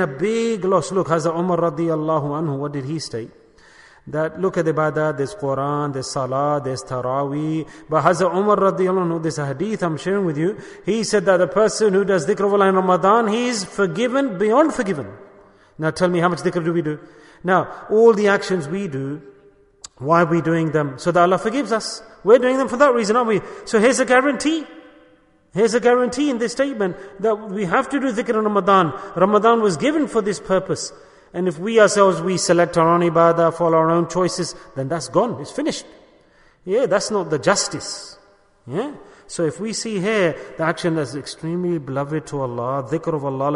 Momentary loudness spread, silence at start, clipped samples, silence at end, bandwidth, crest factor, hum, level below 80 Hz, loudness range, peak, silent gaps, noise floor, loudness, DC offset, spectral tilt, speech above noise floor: 11 LU; 0 s; under 0.1%; 0 s; 11 kHz; 18 dB; none; -56 dBFS; 6 LU; -2 dBFS; none; -54 dBFS; -19 LUFS; under 0.1%; -5.5 dB/octave; 35 dB